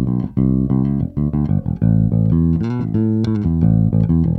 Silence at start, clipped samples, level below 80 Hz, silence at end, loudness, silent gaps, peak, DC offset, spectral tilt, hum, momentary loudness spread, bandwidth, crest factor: 0 s; under 0.1%; -30 dBFS; 0 s; -17 LUFS; none; -4 dBFS; under 0.1%; -11.5 dB/octave; none; 4 LU; 4.5 kHz; 12 dB